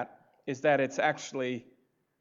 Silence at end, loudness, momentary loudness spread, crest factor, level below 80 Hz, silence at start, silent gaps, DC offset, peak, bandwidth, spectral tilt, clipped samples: 0.6 s; -30 LUFS; 15 LU; 20 dB; -88 dBFS; 0 s; none; under 0.1%; -12 dBFS; 7.8 kHz; -4.5 dB/octave; under 0.1%